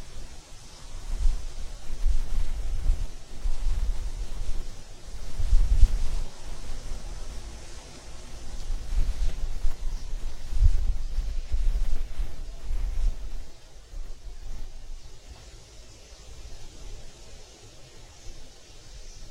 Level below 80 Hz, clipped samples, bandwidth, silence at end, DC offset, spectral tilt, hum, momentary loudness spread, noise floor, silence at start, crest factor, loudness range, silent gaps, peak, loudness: -28 dBFS; under 0.1%; 10 kHz; 0 s; under 0.1%; -4.5 dB/octave; none; 19 LU; -47 dBFS; 0 s; 22 dB; 15 LU; none; -4 dBFS; -35 LUFS